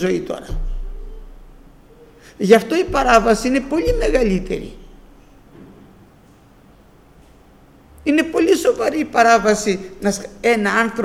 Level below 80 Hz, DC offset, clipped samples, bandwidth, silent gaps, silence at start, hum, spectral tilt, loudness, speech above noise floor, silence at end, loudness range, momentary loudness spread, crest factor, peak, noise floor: -32 dBFS; under 0.1%; under 0.1%; 15.5 kHz; none; 0 s; none; -4.5 dB/octave; -17 LUFS; 32 dB; 0 s; 9 LU; 16 LU; 18 dB; 0 dBFS; -48 dBFS